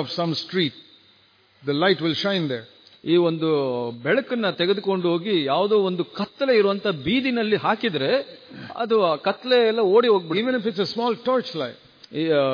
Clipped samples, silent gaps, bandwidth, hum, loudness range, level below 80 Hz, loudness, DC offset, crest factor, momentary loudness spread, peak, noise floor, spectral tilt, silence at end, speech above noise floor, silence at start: under 0.1%; none; 5.2 kHz; none; 3 LU; -66 dBFS; -22 LUFS; under 0.1%; 16 dB; 10 LU; -6 dBFS; -58 dBFS; -7 dB/octave; 0 s; 36 dB; 0 s